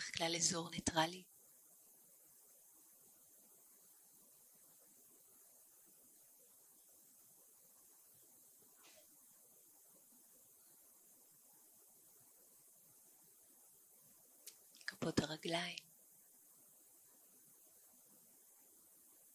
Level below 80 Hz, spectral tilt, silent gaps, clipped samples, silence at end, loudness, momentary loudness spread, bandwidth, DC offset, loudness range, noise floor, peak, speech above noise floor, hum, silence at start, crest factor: -76 dBFS; -2.5 dB/octave; none; under 0.1%; 3.55 s; -41 LUFS; 23 LU; 16 kHz; under 0.1%; 17 LU; -67 dBFS; -20 dBFS; 26 dB; none; 0 s; 30 dB